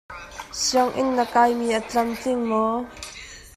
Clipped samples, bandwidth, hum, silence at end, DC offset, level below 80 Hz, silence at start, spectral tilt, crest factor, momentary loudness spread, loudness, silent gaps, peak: under 0.1%; 15 kHz; none; 0.05 s; under 0.1%; -52 dBFS; 0.1 s; -3 dB/octave; 18 dB; 17 LU; -22 LUFS; none; -6 dBFS